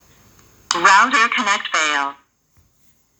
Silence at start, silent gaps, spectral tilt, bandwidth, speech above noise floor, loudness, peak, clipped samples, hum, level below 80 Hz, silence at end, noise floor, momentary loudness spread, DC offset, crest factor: 0.7 s; none; 0 dB/octave; over 20 kHz; 42 dB; -15 LUFS; 0 dBFS; under 0.1%; none; -64 dBFS; 1.05 s; -59 dBFS; 11 LU; under 0.1%; 20 dB